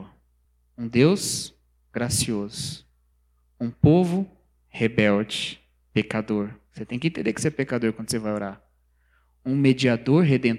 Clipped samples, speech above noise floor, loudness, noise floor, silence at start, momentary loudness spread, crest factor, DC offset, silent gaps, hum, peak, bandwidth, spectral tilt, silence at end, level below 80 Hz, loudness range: under 0.1%; 42 dB; -24 LUFS; -65 dBFS; 0 s; 16 LU; 20 dB; under 0.1%; none; 60 Hz at -50 dBFS; -4 dBFS; 16 kHz; -5.5 dB/octave; 0 s; -52 dBFS; 3 LU